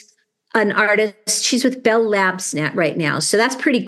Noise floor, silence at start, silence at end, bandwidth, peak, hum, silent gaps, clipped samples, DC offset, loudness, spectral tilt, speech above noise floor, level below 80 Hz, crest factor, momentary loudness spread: -58 dBFS; 0.55 s; 0 s; 12.5 kHz; -2 dBFS; none; none; under 0.1%; under 0.1%; -17 LUFS; -3 dB/octave; 40 dB; -72 dBFS; 16 dB; 4 LU